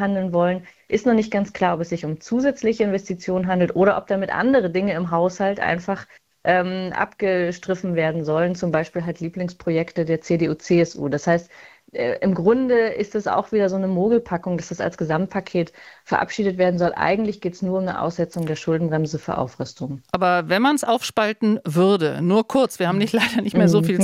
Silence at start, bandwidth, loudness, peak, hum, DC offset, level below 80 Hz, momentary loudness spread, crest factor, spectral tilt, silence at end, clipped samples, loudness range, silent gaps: 0 s; 15 kHz; -21 LUFS; -2 dBFS; none; under 0.1%; -56 dBFS; 8 LU; 18 dB; -6.5 dB/octave; 0 s; under 0.1%; 3 LU; none